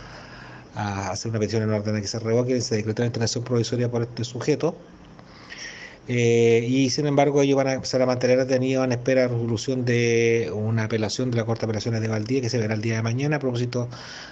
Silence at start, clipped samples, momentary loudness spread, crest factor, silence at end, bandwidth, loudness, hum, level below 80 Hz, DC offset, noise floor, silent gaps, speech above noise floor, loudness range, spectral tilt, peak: 0 s; under 0.1%; 12 LU; 18 dB; 0 s; 8.2 kHz; -23 LUFS; none; -58 dBFS; under 0.1%; -45 dBFS; none; 23 dB; 5 LU; -5.5 dB/octave; -6 dBFS